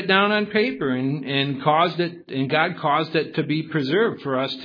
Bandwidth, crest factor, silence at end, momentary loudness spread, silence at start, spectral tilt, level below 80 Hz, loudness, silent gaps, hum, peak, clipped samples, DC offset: 5.4 kHz; 18 dB; 0 s; 5 LU; 0 s; -8 dB/octave; -68 dBFS; -22 LUFS; none; none; -4 dBFS; under 0.1%; under 0.1%